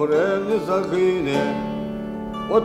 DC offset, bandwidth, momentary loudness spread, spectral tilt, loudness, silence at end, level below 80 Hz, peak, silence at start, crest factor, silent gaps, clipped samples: under 0.1%; 13.5 kHz; 10 LU; -6.5 dB/octave; -22 LUFS; 0 s; -48 dBFS; -4 dBFS; 0 s; 16 dB; none; under 0.1%